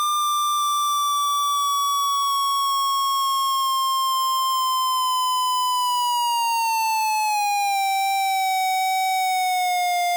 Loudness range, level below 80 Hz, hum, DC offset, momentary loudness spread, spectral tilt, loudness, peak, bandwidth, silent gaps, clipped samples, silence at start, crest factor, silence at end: 0 LU; under -90 dBFS; none; under 0.1%; 1 LU; 7.5 dB/octave; -21 LUFS; -20 dBFS; over 20 kHz; none; under 0.1%; 0 s; 2 dB; 0 s